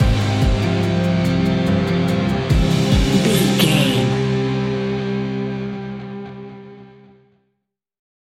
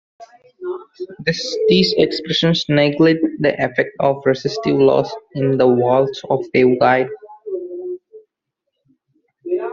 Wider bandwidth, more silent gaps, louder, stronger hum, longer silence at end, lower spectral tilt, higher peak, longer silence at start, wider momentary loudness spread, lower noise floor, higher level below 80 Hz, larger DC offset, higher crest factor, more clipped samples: first, 16 kHz vs 7.6 kHz; neither; about the same, -18 LUFS vs -16 LUFS; neither; first, 1.45 s vs 0 s; about the same, -6 dB/octave vs -6 dB/octave; about the same, -2 dBFS vs -2 dBFS; second, 0 s vs 0.2 s; about the same, 15 LU vs 15 LU; about the same, -75 dBFS vs -78 dBFS; first, -28 dBFS vs -56 dBFS; neither; about the same, 16 dB vs 16 dB; neither